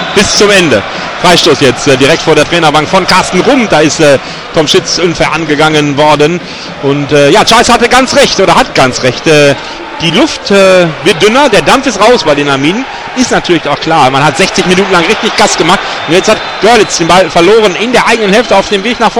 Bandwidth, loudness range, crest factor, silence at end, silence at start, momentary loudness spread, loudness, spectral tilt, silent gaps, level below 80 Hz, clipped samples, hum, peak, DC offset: over 20 kHz; 2 LU; 6 dB; 0 s; 0 s; 6 LU; -6 LUFS; -3.5 dB/octave; none; -34 dBFS; 4%; none; 0 dBFS; 0.7%